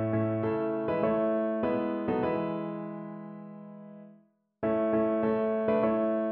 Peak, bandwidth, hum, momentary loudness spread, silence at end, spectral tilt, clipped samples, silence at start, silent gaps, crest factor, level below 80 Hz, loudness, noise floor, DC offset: -14 dBFS; 4.3 kHz; none; 17 LU; 0 s; -7.5 dB/octave; under 0.1%; 0 s; none; 16 dB; -62 dBFS; -29 LUFS; -62 dBFS; under 0.1%